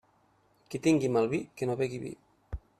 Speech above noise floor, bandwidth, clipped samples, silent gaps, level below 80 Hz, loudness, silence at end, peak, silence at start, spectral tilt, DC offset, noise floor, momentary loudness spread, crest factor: 38 dB; 13.5 kHz; under 0.1%; none; -54 dBFS; -30 LUFS; 0.2 s; -12 dBFS; 0.7 s; -6.5 dB/octave; under 0.1%; -68 dBFS; 19 LU; 18 dB